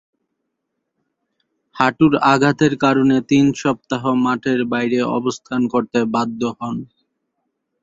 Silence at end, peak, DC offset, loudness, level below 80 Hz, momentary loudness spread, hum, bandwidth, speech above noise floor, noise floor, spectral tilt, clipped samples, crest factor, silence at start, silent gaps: 1 s; 0 dBFS; under 0.1%; -17 LUFS; -56 dBFS; 8 LU; none; 7.8 kHz; 59 dB; -76 dBFS; -6 dB/octave; under 0.1%; 18 dB; 1.75 s; none